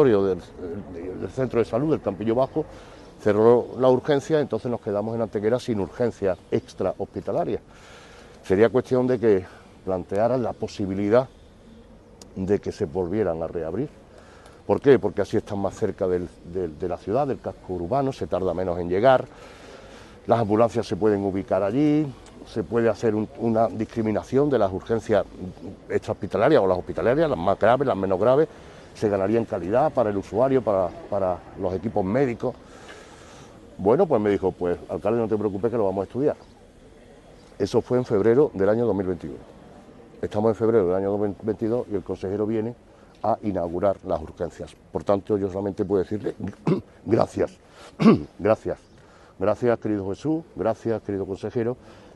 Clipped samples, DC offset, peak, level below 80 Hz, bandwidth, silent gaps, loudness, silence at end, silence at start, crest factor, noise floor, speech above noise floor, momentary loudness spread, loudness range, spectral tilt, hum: under 0.1%; under 0.1%; -4 dBFS; -52 dBFS; 11.5 kHz; none; -24 LUFS; 0.15 s; 0 s; 20 dB; -50 dBFS; 27 dB; 13 LU; 4 LU; -8 dB/octave; none